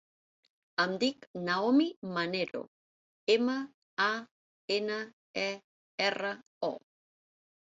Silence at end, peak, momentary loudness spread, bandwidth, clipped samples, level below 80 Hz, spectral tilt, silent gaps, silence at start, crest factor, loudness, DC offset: 1 s; -12 dBFS; 12 LU; 7.8 kHz; under 0.1%; -78 dBFS; -4.5 dB/octave; 1.27-1.34 s, 1.96-2.02 s, 2.68-3.27 s, 3.74-3.97 s, 4.31-4.68 s, 5.13-5.34 s, 5.64-5.98 s, 6.46-6.61 s; 0.8 s; 22 dB; -32 LUFS; under 0.1%